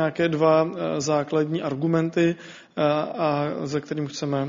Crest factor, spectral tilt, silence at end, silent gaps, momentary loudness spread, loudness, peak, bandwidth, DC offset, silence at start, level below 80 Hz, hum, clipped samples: 16 dB; -6 dB/octave; 0 s; none; 9 LU; -24 LUFS; -6 dBFS; 7.4 kHz; under 0.1%; 0 s; -64 dBFS; none; under 0.1%